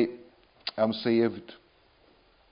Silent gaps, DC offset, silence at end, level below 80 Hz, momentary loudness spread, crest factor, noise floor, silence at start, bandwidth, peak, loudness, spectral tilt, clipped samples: none; under 0.1%; 0.95 s; -70 dBFS; 22 LU; 18 dB; -62 dBFS; 0 s; 5.4 kHz; -12 dBFS; -28 LUFS; -9.5 dB/octave; under 0.1%